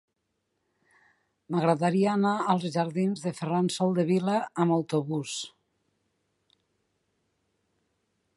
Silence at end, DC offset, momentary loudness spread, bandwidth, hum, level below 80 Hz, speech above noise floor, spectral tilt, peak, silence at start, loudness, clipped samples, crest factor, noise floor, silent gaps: 2.9 s; under 0.1%; 8 LU; 11.5 kHz; none; -76 dBFS; 53 dB; -6.5 dB/octave; -8 dBFS; 1.5 s; -27 LUFS; under 0.1%; 20 dB; -79 dBFS; none